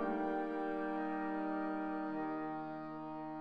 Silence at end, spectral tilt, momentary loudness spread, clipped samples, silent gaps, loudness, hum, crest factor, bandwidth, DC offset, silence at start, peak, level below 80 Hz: 0 s; -8.5 dB/octave; 7 LU; under 0.1%; none; -40 LUFS; none; 14 dB; 5.2 kHz; 0.1%; 0 s; -26 dBFS; -68 dBFS